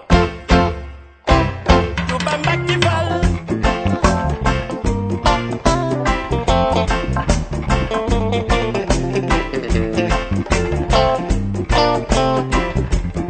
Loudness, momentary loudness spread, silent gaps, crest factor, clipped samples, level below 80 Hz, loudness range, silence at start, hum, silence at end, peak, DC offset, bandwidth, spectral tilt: -18 LUFS; 5 LU; none; 16 dB; under 0.1%; -24 dBFS; 1 LU; 0 s; none; 0 s; 0 dBFS; under 0.1%; 9.2 kHz; -5.5 dB/octave